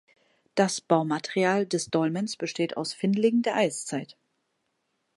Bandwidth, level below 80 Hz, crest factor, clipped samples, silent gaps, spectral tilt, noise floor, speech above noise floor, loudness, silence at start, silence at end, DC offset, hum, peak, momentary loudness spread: 11.5 kHz; -74 dBFS; 20 dB; under 0.1%; none; -5 dB/octave; -77 dBFS; 51 dB; -27 LUFS; 0.55 s; 1.1 s; under 0.1%; none; -8 dBFS; 9 LU